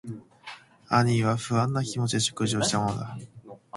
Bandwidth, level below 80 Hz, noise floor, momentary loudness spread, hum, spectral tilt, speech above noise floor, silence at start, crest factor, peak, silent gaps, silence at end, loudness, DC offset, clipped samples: 11.5 kHz; -58 dBFS; -47 dBFS; 20 LU; none; -4.5 dB/octave; 21 dB; 0.05 s; 20 dB; -8 dBFS; none; 0 s; -26 LUFS; under 0.1%; under 0.1%